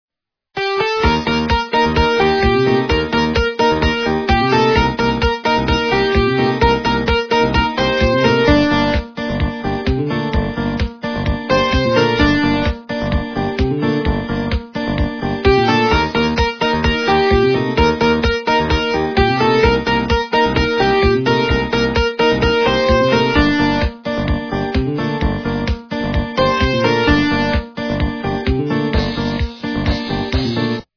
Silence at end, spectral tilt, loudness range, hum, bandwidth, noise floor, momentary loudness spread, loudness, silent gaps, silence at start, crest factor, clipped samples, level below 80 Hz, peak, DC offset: 0.15 s; -6 dB/octave; 4 LU; none; 5.4 kHz; -47 dBFS; 7 LU; -16 LUFS; none; 0.55 s; 16 dB; under 0.1%; -26 dBFS; 0 dBFS; 0.3%